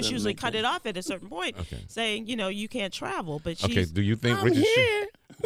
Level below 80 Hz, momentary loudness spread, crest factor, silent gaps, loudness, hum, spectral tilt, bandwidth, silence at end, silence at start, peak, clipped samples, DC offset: -50 dBFS; 12 LU; 18 dB; none; -27 LUFS; none; -5 dB/octave; 16 kHz; 0 s; 0 s; -8 dBFS; under 0.1%; under 0.1%